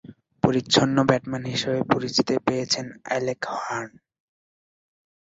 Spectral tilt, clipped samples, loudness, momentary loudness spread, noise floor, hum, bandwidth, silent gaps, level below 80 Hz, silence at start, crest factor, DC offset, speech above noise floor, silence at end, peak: -4.5 dB/octave; under 0.1%; -24 LUFS; 10 LU; under -90 dBFS; none; 8 kHz; none; -58 dBFS; 0.05 s; 22 dB; under 0.1%; over 66 dB; 1.35 s; -2 dBFS